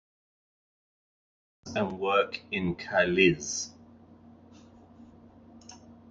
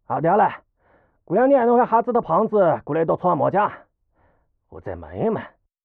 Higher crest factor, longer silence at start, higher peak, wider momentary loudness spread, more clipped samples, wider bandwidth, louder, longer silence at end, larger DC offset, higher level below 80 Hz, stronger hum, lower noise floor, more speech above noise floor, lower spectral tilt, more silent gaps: first, 24 dB vs 14 dB; first, 1.65 s vs 0.1 s; about the same, -8 dBFS vs -6 dBFS; first, 27 LU vs 16 LU; neither; first, 9.2 kHz vs 4.1 kHz; second, -28 LUFS vs -20 LUFS; second, 0.15 s vs 0.35 s; neither; about the same, -58 dBFS vs -56 dBFS; neither; second, -54 dBFS vs -63 dBFS; second, 27 dB vs 44 dB; second, -4 dB/octave vs -11.5 dB/octave; neither